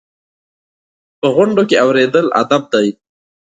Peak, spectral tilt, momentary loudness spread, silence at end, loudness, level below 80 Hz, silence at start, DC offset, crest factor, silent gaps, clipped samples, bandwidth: 0 dBFS; -5.5 dB/octave; 5 LU; 0.65 s; -13 LUFS; -62 dBFS; 1.25 s; under 0.1%; 16 dB; none; under 0.1%; 9.2 kHz